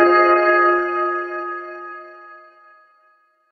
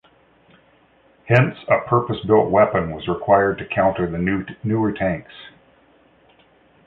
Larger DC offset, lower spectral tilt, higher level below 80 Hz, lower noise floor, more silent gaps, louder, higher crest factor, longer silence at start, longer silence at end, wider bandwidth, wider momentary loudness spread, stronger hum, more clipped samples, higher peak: neither; second, -5.5 dB/octave vs -9.5 dB/octave; second, -64 dBFS vs -48 dBFS; about the same, -59 dBFS vs -56 dBFS; neither; about the same, -17 LUFS vs -19 LUFS; about the same, 18 dB vs 18 dB; second, 0 s vs 1.25 s; second, 1.15 s vs 1.35 s; about the same, 6 kHz vs 5.6 kHz; first, 21 LU vs 9 LU; neither; neither; about the same, -2 dBFS vs -2 dBFS